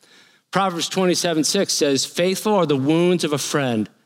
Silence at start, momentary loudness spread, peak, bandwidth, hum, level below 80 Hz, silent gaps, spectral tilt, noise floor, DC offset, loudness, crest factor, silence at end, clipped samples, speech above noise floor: 0.55 s; 4 LU; -2 dBFS; 16.5 kHz; none; -72 dBFS; none; -4 dB/octave; -53 dBFS; under 0.1%; -19 LUFS; 18 dB; 0.2 s; under 0.1%; 34 dB